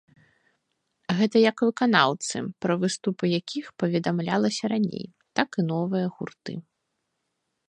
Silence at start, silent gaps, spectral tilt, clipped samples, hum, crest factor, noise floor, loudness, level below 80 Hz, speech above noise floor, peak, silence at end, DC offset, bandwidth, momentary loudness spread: 1.1 s; none; -5 dB/octave; under 0.1%; none; 24 dB; -79 dBFS; -25 LUFS; -70 dBFS; 54 dB; -2 dBFS; 1.1 s; under 0.1%; 10 kHz; 15 LU